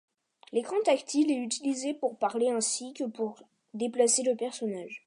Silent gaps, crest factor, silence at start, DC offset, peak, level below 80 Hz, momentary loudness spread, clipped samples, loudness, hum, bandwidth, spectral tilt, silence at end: none; 18 dB; 0.55 s; under 0.1%; -12 dBFS; -86 dBFS; 11 LU; under 0.1%; -29 LUFS; none; 11.5 kHz; -2.5 dB/octave; 0.1 s